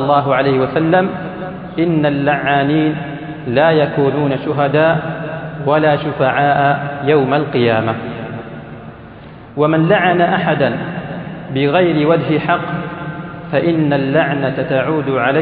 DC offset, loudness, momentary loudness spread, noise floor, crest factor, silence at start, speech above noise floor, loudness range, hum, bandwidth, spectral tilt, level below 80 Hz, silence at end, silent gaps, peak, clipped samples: under 0.1%; -15 LUFS; 14 LU; -35 dBFS; 14 dB; 0 s; 21 dB; 2 LU; none; 4.7 kHz; -12 dB/octave; -48 dBFS; 0 s; none; 0 dBFS; under 0.1%